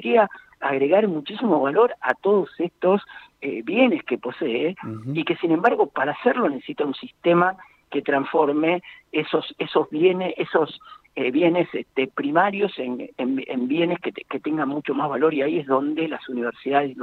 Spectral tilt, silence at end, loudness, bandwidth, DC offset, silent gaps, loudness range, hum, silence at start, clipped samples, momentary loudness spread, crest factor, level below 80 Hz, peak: -8 dB/octave; 0 s; -23 LUFS; 4.5 kHz; under 0.1%; none; 2 LU; none; 0 s; under 0.1%; 9 LU; 18 dB; -70 dBFS; -4 dBFS